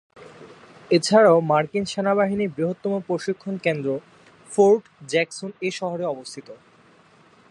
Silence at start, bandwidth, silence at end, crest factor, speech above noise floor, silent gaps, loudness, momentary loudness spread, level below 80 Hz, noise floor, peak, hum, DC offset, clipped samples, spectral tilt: 0.15 s; 11.5 kHz; 0.95 s; 20 dB; 33 dB; none; -22 LUFS; 13 LU; -66 dBFS; -54 dBFS; -2 dBFS; none; under 0.1%; under 0.1%; -5.5 dB/octave